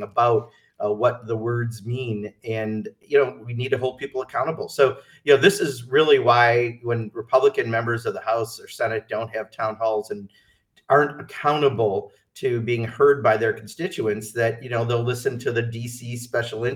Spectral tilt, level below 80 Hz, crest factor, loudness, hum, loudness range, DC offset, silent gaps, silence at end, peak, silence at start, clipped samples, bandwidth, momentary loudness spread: -5.5 dB/octave; -66 dBFS; 20 dB; -23 LUFS; none; 6 LU; under 0.1%; none; 0 s; -2 dBFS; 0 s; under 0.1%; 16 kHz; 12 LU